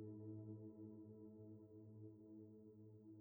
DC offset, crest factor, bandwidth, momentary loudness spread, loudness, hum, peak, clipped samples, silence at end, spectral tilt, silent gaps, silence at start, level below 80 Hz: under 0.1%; 14 dB; over 20 kHz; 8 LU; -60 LUFS; none; -44 dBFS; under 0.1%; 0 s; -11 dB/octave; none; 0 s; under -90 dBFS